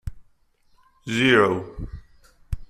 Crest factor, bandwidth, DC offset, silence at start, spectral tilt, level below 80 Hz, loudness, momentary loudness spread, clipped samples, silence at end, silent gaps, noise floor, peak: 20 dB; 13.5 kHz; under 0.1%; 0.05 s; -5.5 dB/octave; -40 dBFS; -20 LUFS; 23 LU; under 0.1%; 0.05 s; none; -60 dBFS; -4 dBFS